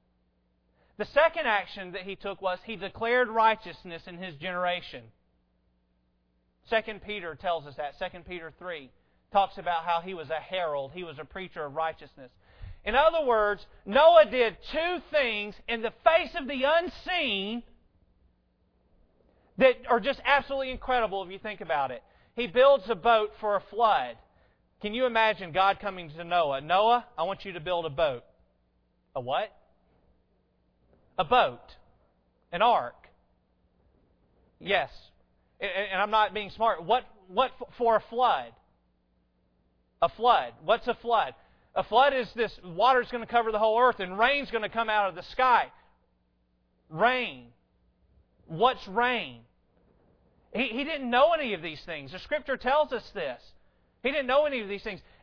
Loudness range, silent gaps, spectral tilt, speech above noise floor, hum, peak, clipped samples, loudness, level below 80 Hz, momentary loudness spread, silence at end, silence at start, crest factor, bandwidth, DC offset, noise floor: 9 LU; none; -6 dB/octave; 44 dB; none; -6 dBFS; under 0.1%; -27 LUFS; -56 dBFS; 15 LU; 0.25 s; 1 s; 22 dB; 5.4 kHz; under 0.1%; -71 dBFS